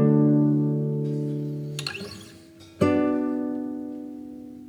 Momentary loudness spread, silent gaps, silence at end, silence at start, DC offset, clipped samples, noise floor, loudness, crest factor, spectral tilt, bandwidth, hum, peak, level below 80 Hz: 18 LU; none; 0 s; 0 s; under 0.1%; under 0.1%; -48 dBFS; -25 LUFS; 16 dB; -7.5 dB/octave; 12.5 kHz; none; -8 dBFS; -68 dBFS